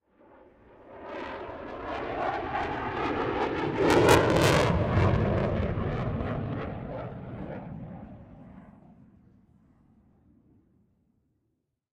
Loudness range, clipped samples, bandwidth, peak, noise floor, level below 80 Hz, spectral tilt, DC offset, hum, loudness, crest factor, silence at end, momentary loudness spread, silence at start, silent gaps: 18 LU; under 0.1%; 15.5 kHz; -4 dBFS; -78 dBFS; -44 dBFS; -6 dB/octave; under 0.1%; none; -28 LUFS; 26 dB; 3.25 s; 20 LU; 0.85 s; none